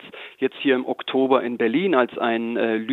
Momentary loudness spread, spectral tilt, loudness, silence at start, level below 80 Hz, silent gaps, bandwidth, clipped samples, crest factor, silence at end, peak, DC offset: 6 LU; -7.5 dB/octave; -22 LUFS; 0.05 s; -74 dBFS; none; 4.2 kHz; under 0.1%; 18 dB; 0 s; -4 dBFS; under 0.1%